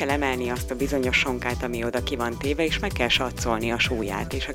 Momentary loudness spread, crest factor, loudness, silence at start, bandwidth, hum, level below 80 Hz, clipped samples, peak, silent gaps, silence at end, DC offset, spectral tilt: 6 LU; 18 dB; -25 LUFS; 0 s; 16.5 kHz; none; -36 dBFS; under 0.1%; -8 dBFS; none; 0 s; under 0.1%; -4.5 dB/octave